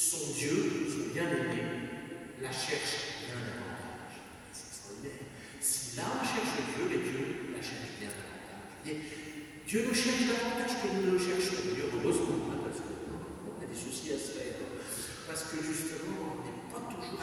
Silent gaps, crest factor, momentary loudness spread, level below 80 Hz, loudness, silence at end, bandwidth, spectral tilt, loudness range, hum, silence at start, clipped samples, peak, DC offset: none; 20 dB; 14 LU; -62 dBFS; -35 LUFS; 0 s; 18 kHz; -3.5 dB/octave; 7 LU; none; 0 s; under 0.1%; -16 dBFS; under 0.1%